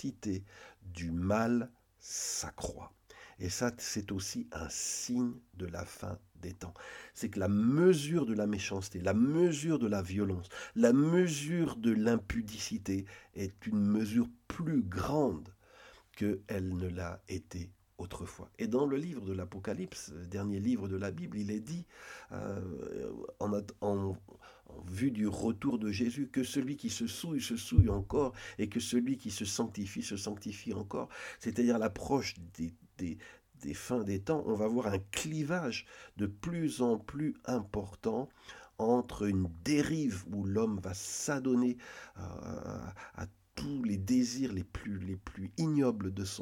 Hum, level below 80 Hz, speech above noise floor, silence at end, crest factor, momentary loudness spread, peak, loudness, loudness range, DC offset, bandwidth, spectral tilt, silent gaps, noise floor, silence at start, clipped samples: none; -54 dBFS; 25 dB; 0 s; 24 dB; 15 LU; -10 dBFS; -35 LUFS; 7 LU; under 0.1%; 17 kHz; -5.5 dB/octave; none; -59 dBFS; 0 s; under 0.1%